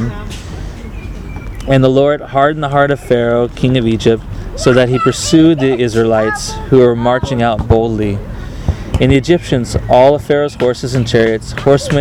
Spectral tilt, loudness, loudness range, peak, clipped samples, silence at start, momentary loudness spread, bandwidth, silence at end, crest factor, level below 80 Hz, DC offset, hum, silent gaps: -6 dB/octave; -12 LUFS; 2 LU; 0 dBFS; 0.1%; 0 s; 17 LU; 15 kHz; 0 s; 12 dB; -28 dBFS; under 0.1%; none; none